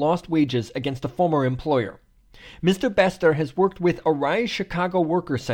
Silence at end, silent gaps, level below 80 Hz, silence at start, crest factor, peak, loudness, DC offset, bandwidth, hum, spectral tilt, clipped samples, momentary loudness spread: 0 s; none; -50 dBFS; 0 s; 18 dB; -6 dBFS; -23 LUFS; under 0.1%; 16.5 kHz; none; -6.5 dB/octave; under 0.1%; 5 LU